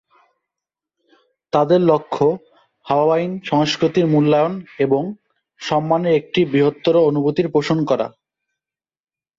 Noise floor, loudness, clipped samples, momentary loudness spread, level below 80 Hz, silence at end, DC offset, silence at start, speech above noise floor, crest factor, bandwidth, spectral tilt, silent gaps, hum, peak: -87 dBFS; -18 LUFS; under 0.1%; 7 LU; -58 dBFS; 1.3 s; under 0.1%; 1.55 s; 70 dB; 16 dB; 7.6 kHz; -7 dB/octave; none; none; -2 dBFS